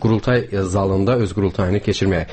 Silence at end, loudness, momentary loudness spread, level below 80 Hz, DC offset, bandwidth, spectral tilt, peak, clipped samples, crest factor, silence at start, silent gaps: 0 s; -19 LUFS; 3 LU; -38 dBFS; under 0.1%; 8.8 kHz; -7 dB/octave; -6 dBFS; under 0.1%; 12 dB; 0 s; none